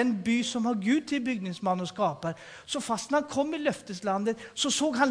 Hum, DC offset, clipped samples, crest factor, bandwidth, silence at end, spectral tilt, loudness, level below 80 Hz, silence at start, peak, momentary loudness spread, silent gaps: none; under 0.1%; under 0.1%; 18 dB; 10.5 kHz; 0 s; -4 dB/octave; -29 LUFS; -68 dBFS; 0 s; -10 dBFS; 8 LU; none